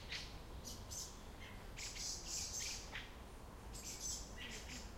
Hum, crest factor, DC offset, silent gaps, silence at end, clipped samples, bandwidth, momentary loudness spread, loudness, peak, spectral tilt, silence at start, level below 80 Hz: none; 18 dB; under 0.1%; none; 0 s; under 0.1%; 16.5 kHz; 11 LU; -47 LUFS; -32 dBFS; -1.5 dB/octave; 0 s; -56 dBFS